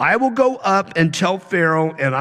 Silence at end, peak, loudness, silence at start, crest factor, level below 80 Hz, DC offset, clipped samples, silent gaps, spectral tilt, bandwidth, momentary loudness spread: 0 s; -4 dBFS; -17 LUFS; 0 s; 14 dB; -60 dBFS; under 0.1%; under 0.1%; none; -5.5 dB/octave; 12.5 kHz; 3 LU